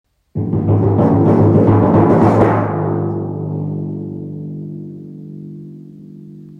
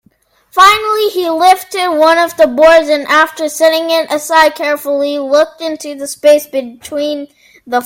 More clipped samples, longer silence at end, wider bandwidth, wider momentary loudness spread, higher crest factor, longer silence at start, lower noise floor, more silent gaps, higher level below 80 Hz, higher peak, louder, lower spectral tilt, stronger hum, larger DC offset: second, under 0.1% vs 0.5%; about the same, 0.05 s vs 0 s; second, 4.1 kHz vs 17 kHz; first, 21 LU vs 13 LU; about the same, 14 dB vs 12 dB; second, 0.35 s vs 0.55 s; second, -35 dBFS vs -53 dBFS; neither; first, -44 dBFS vs -50 dBFS; about the same, -2 dBFS vs 0 dBFS; second, -14 LUFS vs -11 LUFS; first, -11 dB/octave vs -1.5 dB/octave; neither; neither